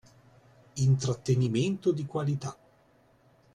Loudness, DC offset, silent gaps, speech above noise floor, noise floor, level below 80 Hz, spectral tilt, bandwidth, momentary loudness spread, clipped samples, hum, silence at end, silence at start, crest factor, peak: -29 LUFS; under 0.1%; none; 36 dB; -63 dBFS; -60 dBFS; -7 dB/octave; 10.5 kHz; 9 LU; under 0.1%; none; 1 s; 0.75 s; 16 dB; -14 dBFS